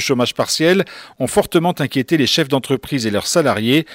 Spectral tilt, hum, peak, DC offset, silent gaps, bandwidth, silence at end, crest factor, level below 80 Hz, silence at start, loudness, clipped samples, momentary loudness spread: -4.5 dB/octave; none; -4 dBFS; under 0.1%; none; 16.5 kHz; 0 s; 14 dB; -52 dBFS; 0 s; -16 LUFS; under 0.1%; 5 LU